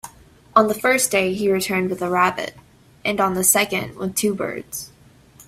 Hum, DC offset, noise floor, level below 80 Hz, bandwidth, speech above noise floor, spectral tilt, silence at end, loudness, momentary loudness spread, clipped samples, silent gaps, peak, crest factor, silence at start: none; under 0.1%; -50 dBFS; -56 dBFS; 16 kHz; 30 dB; -3 dB/octave; 0.05 s; -20 LUFS; 15 LU; under 0.1%; none; 0 dBFS; 20 dB; 0.05 s